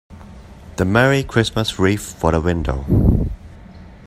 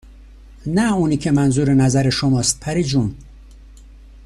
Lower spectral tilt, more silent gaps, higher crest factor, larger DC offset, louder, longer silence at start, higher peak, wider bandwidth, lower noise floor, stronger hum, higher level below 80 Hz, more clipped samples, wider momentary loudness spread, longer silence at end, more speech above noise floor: about the same, -6 dB/octave vs -5.5 dB/octave; neither; about the same, 18 dB vs 14 dB; neither; about the same, -18 LUFS vs -17 LUFS; about the same, 0.1 s vs 0.1 s; first, 0 dBFS vs -4 dBFS; first, 15.5 kHz vs 13.5 kHz; about the same, -39 dBFS vs -41 dBFS; neither; first, -28 dBFS vs -40 dBFS; neither; about the same, 8 LU vs 6 LU; second, 0.1 s vs 0.6 s; about the same, 23 dB vs 25 dB